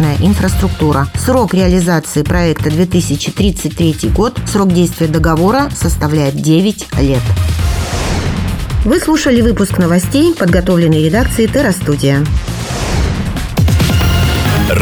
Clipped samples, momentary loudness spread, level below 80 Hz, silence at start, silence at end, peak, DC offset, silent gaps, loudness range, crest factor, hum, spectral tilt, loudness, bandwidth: under 0.1%; 5 LU; -20 dBFS; 0 s; 0 s; 0 dBFS; under 0.1%; none; 2 LU; 12 dB; none; -6 dB/octave; -12 LUFS; over 20 kHz